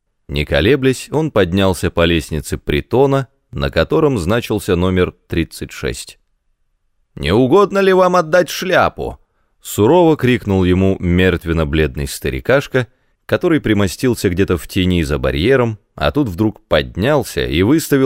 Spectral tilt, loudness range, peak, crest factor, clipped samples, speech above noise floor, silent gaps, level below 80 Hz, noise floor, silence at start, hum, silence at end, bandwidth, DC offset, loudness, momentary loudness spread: -6 dB/octave; 4 LU; 0 dBFS; 14 dB; under 0.1%; 48 dB; none; -32 dBFS; -63 dBFS; 0.3 s; none; 0 s; 16 kHz; 0.1%; -15 LUFS; 11 LU